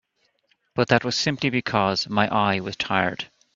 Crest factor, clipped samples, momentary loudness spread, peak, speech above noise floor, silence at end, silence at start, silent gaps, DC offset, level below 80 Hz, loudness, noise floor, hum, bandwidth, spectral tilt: 24 dB; under 0.1%; 6 LU; 0 dBFS; 45 dB; 0.3 s; 0.75 s; none; under 0.1%; -58 dBFS; -23 LUFS; -68 dBFS; none; 7.8 kHz; -4.5 dB/octave